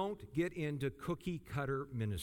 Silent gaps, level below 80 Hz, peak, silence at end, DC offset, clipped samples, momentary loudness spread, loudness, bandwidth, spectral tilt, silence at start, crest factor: none; -60 dBFS; -24 dBFS; 0 s; under 0.1%; under 0.1%; 3 LU; -40 LUFS; 18 kHz; -7 dB/octave; 0 s; 16 dB